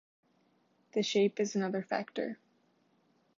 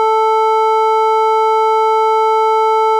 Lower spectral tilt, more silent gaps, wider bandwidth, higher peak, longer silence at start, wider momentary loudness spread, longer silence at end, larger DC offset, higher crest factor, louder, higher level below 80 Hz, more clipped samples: first, -4.5 dB/octave vs 1 dB/octave; neither; second, 7.6 kHz vs 12.5 kHz; second, -18 dBFS vs -6 dBFS; first, 0.95 s vs 0 s; first, 10 LU vs 0 LU; first, 1 s vs 0 s; neither; first, 18 dB vs 6 dB; second, -33 LUFS vs -12 LUFS; about the same, -86 dBFS vs under -90 dBFS; neither